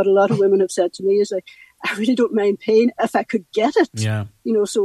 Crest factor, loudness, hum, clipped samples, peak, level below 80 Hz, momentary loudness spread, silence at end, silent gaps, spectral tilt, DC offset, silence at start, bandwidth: 14 dB; -19 LUFS; none; under 0.1%; -4 dBFS; -64 dBFS; 8 LU; 0 s; none; -6 dB/octave; under 0.1%; 0 s; 12.5 kHz